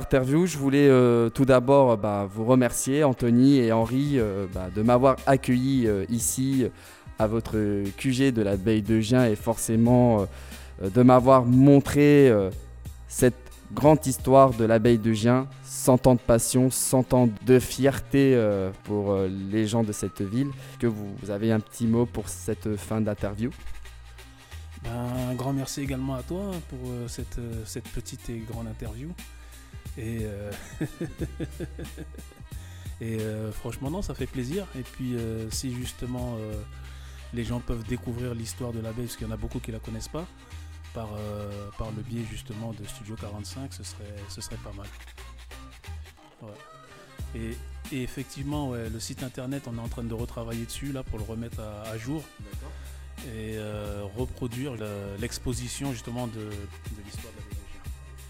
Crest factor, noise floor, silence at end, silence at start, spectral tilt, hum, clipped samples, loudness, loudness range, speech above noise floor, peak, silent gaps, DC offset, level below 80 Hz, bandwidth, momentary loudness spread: 20 dB; -46 dBFS; 0 s; 0 s; -6 dB/octave; none; under 0.1%; -25 LUFS; 16 LU; 21 dB; -4 dBFS; none; under 0.1%; -44 dBFS; 17.5 kHz; 22 LU